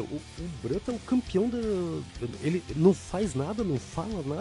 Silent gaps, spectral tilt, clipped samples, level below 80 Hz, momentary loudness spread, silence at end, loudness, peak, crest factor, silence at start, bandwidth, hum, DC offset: none; -7 dB/octave; under 0.1%; -48 dBFS; 13 LU; 0 s; -30 LUFS; -8 dBFS; 20 dB; 0 s; 11.5 kHz; none; under 0.1%